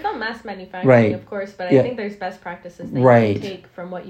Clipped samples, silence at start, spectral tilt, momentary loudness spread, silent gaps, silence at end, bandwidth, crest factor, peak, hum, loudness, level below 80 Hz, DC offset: under 0.1%; 0 s; -8.5 dB/octave; 19 LU; none; 0 s; 8.4 kHz; 18 dB; 0 dBFS; none; -18 LUFS; -58 dBFS; under 0.1%